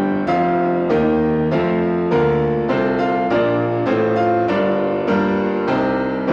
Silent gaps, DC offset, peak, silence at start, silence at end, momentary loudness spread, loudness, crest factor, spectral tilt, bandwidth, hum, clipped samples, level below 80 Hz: none; under 0.1%; -6 dBFS; 0 s; 0 s; 2 LU; -18 LUFS; 12 dB; -8.5 dB/octave; 7 kHz; none; under 0.1%; -44 dBFS